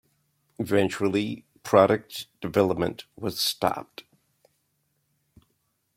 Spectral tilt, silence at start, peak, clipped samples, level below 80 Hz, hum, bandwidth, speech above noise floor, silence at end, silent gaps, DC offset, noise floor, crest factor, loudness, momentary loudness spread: -5 dB/octave; 0.6 s; -4 dBFS; under 0.1%; -62 dBFS; none; 16.5 kHz; 49 dB; 2.15 s; none; under 0.1%; -74 dBFS; 24 dB; -25 LUFS; 17 LU